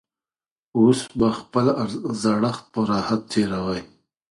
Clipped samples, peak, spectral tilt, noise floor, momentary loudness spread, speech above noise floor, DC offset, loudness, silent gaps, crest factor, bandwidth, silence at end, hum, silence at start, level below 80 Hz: under 0.1%; -4 dBFS; -6 dB/octave; under -90 dBFS; 8 LU; over 69 dB; under 0.1%; -22 LUFS; none; 18 dB; 11.5 kHz; 0.45 s; none; 0.75 s; -54 dBFS